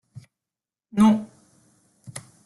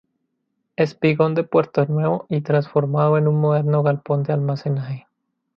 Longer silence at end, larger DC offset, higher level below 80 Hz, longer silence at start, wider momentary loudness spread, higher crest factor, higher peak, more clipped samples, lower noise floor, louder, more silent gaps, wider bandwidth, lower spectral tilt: second, 0.25 s vs 0.55 s; neither; about the same, -62 dBFS vs -64 dBFS; first, 0.95 s vs 0.8 s; first, 22 LU vs 7 LU; about the same, 18 dB vs 16 dB; second, -8 dBFS vs -4 dBFS; neither; first, under -90 dBFS vs -74 dBFS; about the same, -21 LUFS vs -20 LUFS; neither; first, 12 kHz vs 6 kHz; second, -6.5 dB/octave vs -9.5 dB/octave